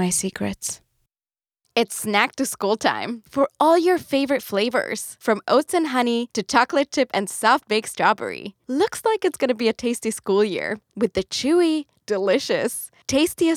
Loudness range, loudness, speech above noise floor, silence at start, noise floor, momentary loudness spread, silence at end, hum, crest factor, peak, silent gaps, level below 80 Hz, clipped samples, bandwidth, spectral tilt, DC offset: 2 LU; -22 LUFS; over 69 dB; 0 s; under -90 dBFS; 8 LU; 0 s; none; 20 dB; -2 dBFS; none; -60 dBFS; under 0.1%; over 20 kHz; -3.5 dB/octave; under 0.1%